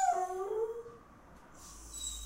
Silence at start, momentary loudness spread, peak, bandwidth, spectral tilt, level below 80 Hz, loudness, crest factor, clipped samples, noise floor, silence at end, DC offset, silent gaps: 0 s; 22 LU; -20 dBFS; 16 kHz; -2.5 dB/octave; -58 dBFS; -37 LUFS; 18 dB; under 0.1%; -57 dBFS; 0 s; under 0.1%; none